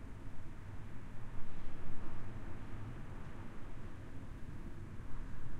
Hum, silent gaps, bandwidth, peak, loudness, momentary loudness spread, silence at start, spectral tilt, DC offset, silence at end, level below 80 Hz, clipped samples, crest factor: none; none; 4.1 kHz; -22 dBFS; -51 LUFS; 3 LU; 0 s; -7 dB/octave; under 0.1%; 0 s; -48 dBFS; under 0.1%; 14 dB